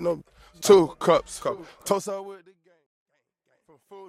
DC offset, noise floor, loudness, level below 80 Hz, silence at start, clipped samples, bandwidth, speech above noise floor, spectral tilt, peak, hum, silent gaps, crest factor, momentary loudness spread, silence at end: under 0.1%; -72 dBFS; -23 LUFS; -58 dBFS; 0 s; under 0.1%; 15.5 kHz; 49 dB; -4.5 dB/octave; -4 dBFS; none; 2.86-3.06 s; 22 dB; 17 LU; 0.05 s